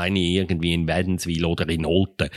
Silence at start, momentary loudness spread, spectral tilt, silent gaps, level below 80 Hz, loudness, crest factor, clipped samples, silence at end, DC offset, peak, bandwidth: 0 s; 2 LU; -5.5 dB/octave; none; -40 dBFS; -22 LUFS; 16 dB; under 0.1%; 0 s; under 0.1%; -6 dBFS; 13 kHz